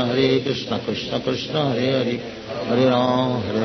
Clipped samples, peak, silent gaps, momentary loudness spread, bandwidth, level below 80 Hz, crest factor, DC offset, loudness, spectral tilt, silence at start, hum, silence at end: under 0.1%; -4 dBFS; none; 7 LU; 6.4 kHz; -54 dBFS; 16 dB; under 0.1%; -21 LUFS; -6.5 dB/octave; 0 s; none; 0 s